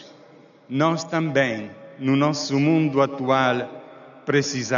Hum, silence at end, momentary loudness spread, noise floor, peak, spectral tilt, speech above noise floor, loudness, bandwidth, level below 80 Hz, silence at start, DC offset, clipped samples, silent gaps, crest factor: none; 0 s; 13 LU; -50 dBFS; -6 dBFS; -5 dB/octave; 29 dB; -22 LUFS; 7.4 kHz; -66 dBFS; 0 s; under 0.1%; under 0.1%; none; 16 dB